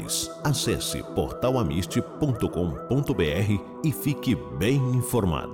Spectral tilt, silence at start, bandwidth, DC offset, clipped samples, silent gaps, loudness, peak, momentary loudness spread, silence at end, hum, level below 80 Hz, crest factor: -5.5 dB/octave; 0 s; 19 kHz; under 0.1%; under 0.1%; none; -26 LUFS; -14 dBFS; 4 LU; 0 s; none; -44 dBFS; 12 dB